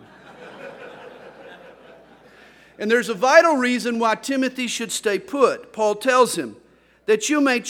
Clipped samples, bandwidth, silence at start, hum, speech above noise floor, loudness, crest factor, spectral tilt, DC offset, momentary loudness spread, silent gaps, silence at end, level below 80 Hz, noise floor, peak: under 0.1%; 17 kHz; 0.3 s; none; 30 dB; -20 LUFS; 22 dB; -3 dB/octave; under 0.1%; 24 LU; none; 0 s; -68 dBFS; -49 dBFS; 0 dBFS